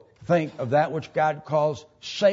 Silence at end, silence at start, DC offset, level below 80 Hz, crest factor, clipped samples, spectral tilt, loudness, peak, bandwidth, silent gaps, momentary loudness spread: 0 s; 0.2 s; under 0.1%; -64 dBFS; 16 dB; under 0.1%; -6 dB/octave; -25 LUFS; -8 dBFS; 7.8 kHz; none; 5 LU